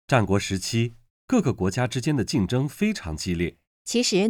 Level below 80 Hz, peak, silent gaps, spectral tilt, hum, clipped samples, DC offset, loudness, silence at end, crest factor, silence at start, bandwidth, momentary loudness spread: -48 dBFS; -6 dBFS; 1.10-1.28 s, 3.67-3.85 s; -5 dB/octave; none; under 0.1%; under 0.1%; -25 LUFS; 0 s; 18 dB; 0.1 s; 18 kHz; 7 LU